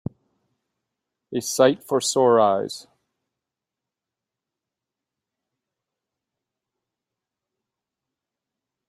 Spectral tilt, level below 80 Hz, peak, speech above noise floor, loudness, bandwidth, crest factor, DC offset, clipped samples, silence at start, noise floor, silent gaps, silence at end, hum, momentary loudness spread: -4 dB/octave; -70 dBFS; -4 dBFS; 67 dB; -20 LUFS; 16 kHz; 24 dB; under 0.1%; under 0.1%; 1.3 s; -87 dBFS; none; 6.05 s; none; 17 LU